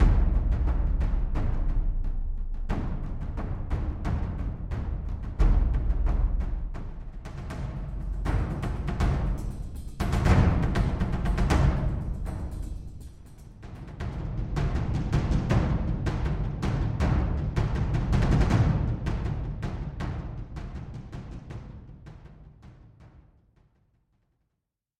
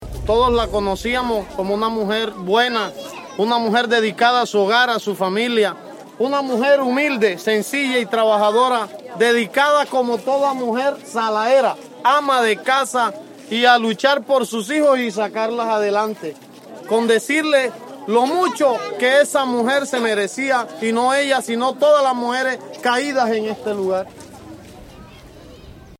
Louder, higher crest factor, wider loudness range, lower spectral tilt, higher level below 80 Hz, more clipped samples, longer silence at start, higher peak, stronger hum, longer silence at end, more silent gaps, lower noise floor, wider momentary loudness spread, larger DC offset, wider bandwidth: second, -29 LUFS vs -18 LUFS; about the same, 18 dB vs 18 dB; first, 11 LU vs 2 LU; first, -7.5 dB/octave vs -3.5 dB/octave; first, -30 dBFS vs -44 dBFS; neither; about the same, 0 s vs 0 s; second, -10 dBFS vs -2 dBFS; neither; first, 1.8 s vs 0.05 s; neither; first, -83 dBFS vs -41 dBFS; first, 17 LU vs 8 LU; first, 0.1% vs under 0.1%; second, 9.8 kHz vs 16.5 kHz